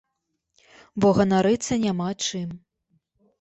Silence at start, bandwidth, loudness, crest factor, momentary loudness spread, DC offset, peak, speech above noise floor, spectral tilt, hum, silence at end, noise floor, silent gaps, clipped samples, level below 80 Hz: 0.95 s; 8.4 kHz; -23 LUFS; 16 dB; 17 LU; under 0.1%; -8 dBFS; 57 dB; -5.5 dB/octave; none; 0.85 s; -79 dBFS; none; under 0.1%; -54 dBFS